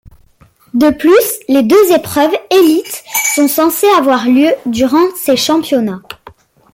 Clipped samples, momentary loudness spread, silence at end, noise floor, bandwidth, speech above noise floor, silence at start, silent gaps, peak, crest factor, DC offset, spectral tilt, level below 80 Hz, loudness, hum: under 0.1%; 7 LU; 0.6 s; -47 dBFS; 17 kHz; 37 dB; 0.75 s; none; 0 dBFS; 10 dB; under 0.1%; -3.5 dB/octave; -48 dBFS; -11 LUFS; none